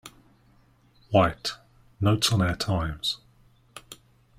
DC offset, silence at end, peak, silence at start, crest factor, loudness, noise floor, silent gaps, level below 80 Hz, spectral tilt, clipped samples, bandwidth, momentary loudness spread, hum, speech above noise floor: under 0.1%; 0.45 s; -6 dBFS; 0.05 s; 24 dB; -25 LUFS; -60 dBFS; none; -48 dBFS; -5 dB/octave; under 0.1%; 15.5 kHz; 25 LU; none; 36 dB